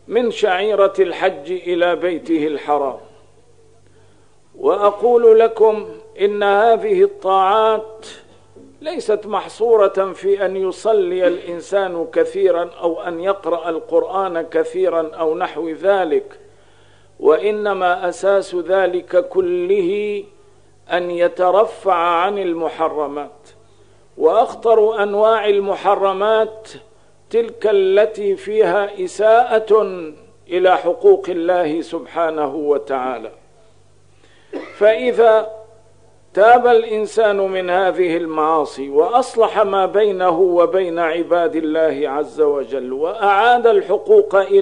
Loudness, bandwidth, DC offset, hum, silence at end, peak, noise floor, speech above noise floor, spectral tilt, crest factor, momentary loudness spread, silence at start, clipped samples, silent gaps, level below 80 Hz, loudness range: -16 LUFS; 10 kHz; 0.3%; 50 Hz at -55 dBFS; 0 s; 0 dBFS; -53 dBFS; 37 dB; -5 dB/octave; 16 dB; 9 LU; 0.1 s; under 0.1%; none; -62 dBFS; 4 LU